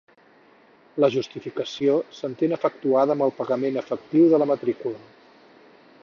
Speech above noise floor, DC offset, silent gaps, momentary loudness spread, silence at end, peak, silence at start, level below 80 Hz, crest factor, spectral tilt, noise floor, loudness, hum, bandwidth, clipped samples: 33 dB; under 0.1%; none; 14 LU; 1.05 s; -6 dBFS; 0.95 s; -74 dBFS; 18 dB; -7 dB/octave; -55 dBFS; -23 LUFS; none; 7 kHz; under 0.1%